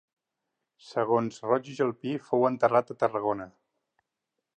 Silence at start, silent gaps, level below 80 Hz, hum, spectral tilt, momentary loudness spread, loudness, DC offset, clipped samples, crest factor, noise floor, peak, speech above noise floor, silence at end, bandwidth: 0.85 s; none; -74 dBFS; none; -7 dB/octave; 10 LU; -28 LUFS; under 0.1%; under 0.1%; 20 dB; -85 dBFS; -8 dBFS; 58 dB; 1.1 s; 9.2 kHz